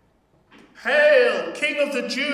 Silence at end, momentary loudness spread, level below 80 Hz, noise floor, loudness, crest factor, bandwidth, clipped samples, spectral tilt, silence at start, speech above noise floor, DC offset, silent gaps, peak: 0 s; 8 LU; -70 dBFS; -61 dBFS; -19 LUFS; 16 dB; 14.5 kHz; under 0.1%; -2.5 dB/octave; 0.8 s; 41 dB; under 0.1%; none; -4 dBFS